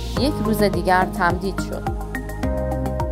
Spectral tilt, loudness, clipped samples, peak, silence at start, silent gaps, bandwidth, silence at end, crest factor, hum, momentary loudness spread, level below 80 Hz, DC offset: -6 dB/octave; -22 LUFS; under 0.1%; -4 dBFS; 0 s; none; 16 kHz; 0 s; 18 dB; none; 9 LU; -30 dBFS; under 0.1%